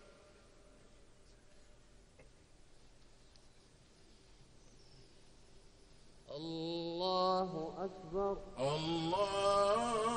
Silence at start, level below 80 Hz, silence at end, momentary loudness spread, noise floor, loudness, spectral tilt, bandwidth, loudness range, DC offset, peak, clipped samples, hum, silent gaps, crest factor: 0 s; -62 dBFS; 0 s; 12 LU; -63 dBFS; -37 LUFS; -5 dB/octave; 10.5 kHz; 14 LU; under 0.1%; -20 dBFS; under 0.1%; none; none; 20 dB